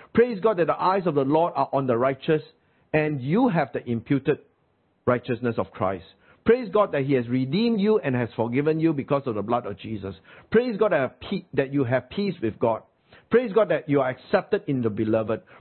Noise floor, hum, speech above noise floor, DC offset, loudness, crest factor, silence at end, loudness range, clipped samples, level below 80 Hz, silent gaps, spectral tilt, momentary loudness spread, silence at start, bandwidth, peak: -67 dBFS; none; 44 dB; under 0.1%; -24 LUFS; 18 dB; 0.2 s; 2 LU; under 0.1%; -60 dBFS; none; -11.5 dB/octave; 7 LU; 0.15 s; 4.4 kHz; -6 dBFS